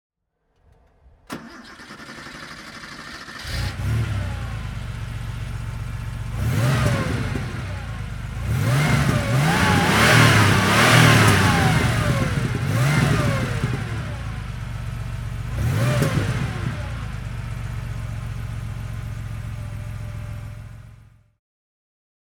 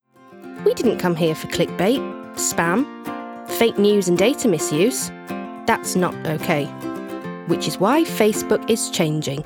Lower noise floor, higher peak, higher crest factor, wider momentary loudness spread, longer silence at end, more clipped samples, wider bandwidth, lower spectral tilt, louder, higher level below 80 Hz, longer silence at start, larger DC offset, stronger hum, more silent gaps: first, -69 dBFS vs -42 dBFS; about the same, -2 dBFS vs -4 dBFS; about the same, 20 dB vs 18 dB; first, 21 LU vs 13 LU; first, 1.4 s vs 0 s; neither; about the same, 19.5 kHz vs 19.5 kHz; about the same, -5 dB/octave vs -4.5 dB/octave; about the same, -21 LUFS vs -20 LUFS; first, -34 dBFS vs -58 dBFS; first, 1.3 s vs 0.3 s; neither; neither; neither